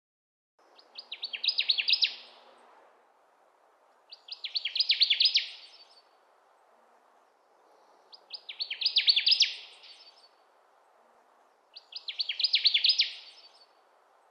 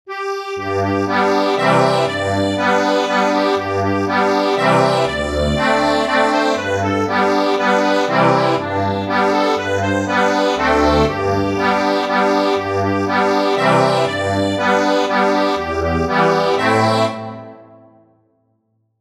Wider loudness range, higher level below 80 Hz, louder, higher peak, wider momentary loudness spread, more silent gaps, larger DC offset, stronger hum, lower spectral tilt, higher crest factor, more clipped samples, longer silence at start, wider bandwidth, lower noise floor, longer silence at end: first, 4 LU vs 1 LU; second, under -90 dBFS vs -38 dBFS; second, -25 LUFS vs -16 LUFS; second, -12 dBFS vs 0 dBFS; first, 23 LU vs 5 LU; neither; neither; neither; second, 5.5 dB/octave vs -5.5 dB/octave; first, 22 dB vs 16 dB; neither; first, 0.95 s vs 0.05 s; second, 12 kHz vs 14 kHz; about the same, -65 dBFS vs -65 dBFS; second, 1 s vs 1.4 s